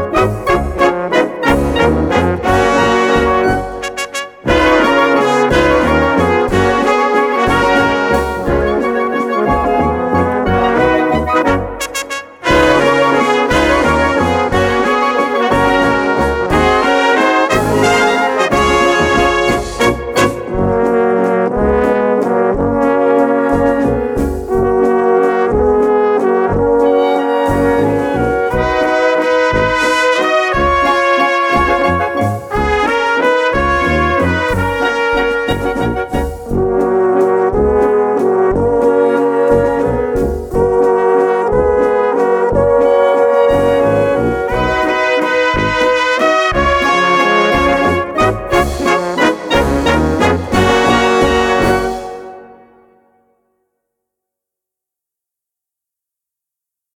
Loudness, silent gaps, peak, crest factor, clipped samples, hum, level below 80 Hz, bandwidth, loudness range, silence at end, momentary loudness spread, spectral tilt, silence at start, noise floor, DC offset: -12 LUFS; none; 0 dBFS; 12 dB; under 0.1%; none; -28 dBFS; 17 kHz; 2 LU; 4.4 s; 5 LU; -5.5 dB/octave; 0 s; -83 dBFS; under 0.1%